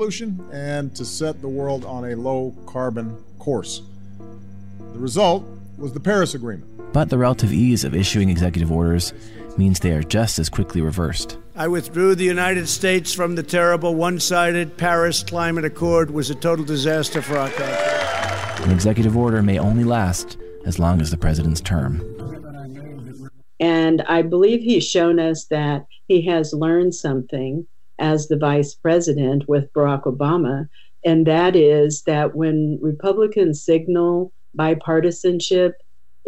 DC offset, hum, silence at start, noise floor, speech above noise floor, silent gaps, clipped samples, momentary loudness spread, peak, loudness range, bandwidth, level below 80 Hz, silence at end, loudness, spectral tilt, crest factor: 1%; none; 0 s; -40 dBFS; 21 dB; none; under 0.1%; 12 LU; -4 dBFS; 6 LU; 16 kHz; -38 dBFS; 0.55 s; -19 LUFS; -5.5 dB/octave; 16 dB